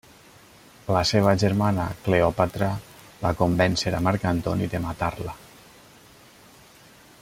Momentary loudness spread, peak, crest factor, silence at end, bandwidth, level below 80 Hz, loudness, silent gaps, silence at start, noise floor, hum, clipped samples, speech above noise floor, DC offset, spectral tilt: 11 LU; -4 dBFS; 20 dB; 1.85 s; 16 kHz; -48 dBFS; -24 LUFS; none; 0.85 s; -51 dBFS; none; under 0.1%; 28 dB; under 0.1%; -6 dB/octave